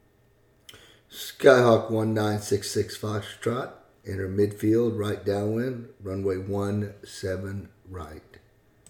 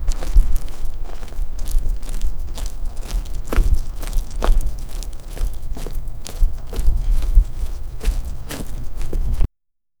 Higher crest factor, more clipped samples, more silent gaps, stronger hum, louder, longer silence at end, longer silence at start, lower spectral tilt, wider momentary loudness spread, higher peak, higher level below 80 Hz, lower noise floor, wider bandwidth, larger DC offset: first, 24 dB vs 18 dB; neither; neither; neither; about the same, -26 LUFS vs -27 LUFS; first, 0.7 s vs 0.55 s; first, 0.75 s vs 0 s; about the same, -6 dB/octave vs -5.5 dB/octave; first, 19 LU vs 12 LU; about the same, -2 dBFS vs 0 dBFS; second, -60 dBFS vs -20 dBFS; second, -62 dBFS vs -77 dBFS; about the same, 19 kHz vs 17.5 kHz; neither